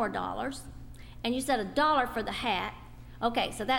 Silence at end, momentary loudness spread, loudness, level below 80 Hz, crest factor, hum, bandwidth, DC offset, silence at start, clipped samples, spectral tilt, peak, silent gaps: 0 s; 23 LU; -31 LUFS; -50 dBFS; 18 dB; none; 16 kHz; under 0.1%; 0 s; under 0.1%; -4 dB/octave; -14 dBFS; none